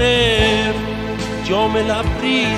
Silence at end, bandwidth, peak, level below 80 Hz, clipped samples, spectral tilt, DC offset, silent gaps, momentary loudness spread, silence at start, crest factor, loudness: 0 s; 15.5 kHz; -2 dBFS; -30 dBFS; under 0.1%; -5 dB/octave; under 0.1%; none; 10 LU; 0 s; 16 dB; -17 LUFS